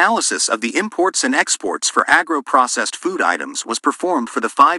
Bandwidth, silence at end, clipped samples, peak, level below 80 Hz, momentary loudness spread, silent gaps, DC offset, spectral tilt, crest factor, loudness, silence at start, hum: 16 kHz; 0 s; under 0.1%; 0 dBFS; -66 dBFS; 6 LU; none; under 0.1%; -1 dB/octave; 18 dB; -17 LUFS; 0 s; none